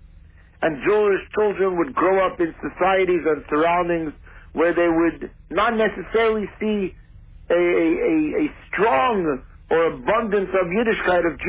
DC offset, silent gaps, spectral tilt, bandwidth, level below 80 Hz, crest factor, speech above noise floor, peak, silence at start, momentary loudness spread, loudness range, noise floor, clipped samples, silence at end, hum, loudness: under 0.1%; none; -9.5 dB/octave; 4 kHz; -46 dBFS; 14 dB; 27 dB; -8 dBFS; 0.6 s; 7 LU; 1 LU; -47 dBFS; under 0.1%; 0 s; none; -21 LUFS